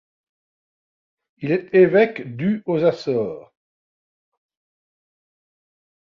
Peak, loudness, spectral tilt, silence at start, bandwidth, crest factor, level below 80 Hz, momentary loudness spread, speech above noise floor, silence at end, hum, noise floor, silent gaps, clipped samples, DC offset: -4 dBFS; -19 LUFS; -8.5 dB/octave; 1.4 s; 7 kHz; 20 dB; -66 dBFS; 14 LU; over 71 dB; 2.6 s; none; under -90 dBFS; none; under 0.1%; under 0.1%